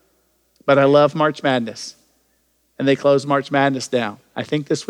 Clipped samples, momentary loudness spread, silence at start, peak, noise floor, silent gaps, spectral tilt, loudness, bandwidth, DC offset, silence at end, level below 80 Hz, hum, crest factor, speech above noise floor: under 0.1%; 14 LU; 0.65 s; -2 dBFS; -64 dBFS; none; -5.5 dB/octave; -18 LUFS; 11.5 kHz; under 0.1%; 0.05 s; -68 dBFS; none; 16 dB; 46 dB